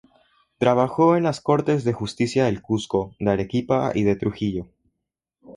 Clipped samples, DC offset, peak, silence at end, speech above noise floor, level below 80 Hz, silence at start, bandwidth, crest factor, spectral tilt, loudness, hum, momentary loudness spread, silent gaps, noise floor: under 0.1%; under 0.1%; -6 dBFS; 0.05 s; 60 dB; -50 dBFS; 0.6 s; 11 kHz; 18 dB; -7 dB/octave; -22 LUFS; none; 8 LU; none; -81 dBFS